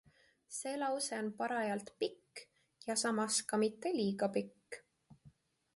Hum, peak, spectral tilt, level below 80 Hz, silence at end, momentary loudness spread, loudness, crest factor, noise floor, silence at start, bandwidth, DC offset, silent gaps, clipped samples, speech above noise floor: none; -22 dBFS; -3.5 dB/octave; -82 dBFS; 0.45 s; 18 LU; -37 LUFS; 18 dB; -66 dBFS; 0.5 s; 11.5 kHz; under 0.1%; none; under 0.1%; 29 dB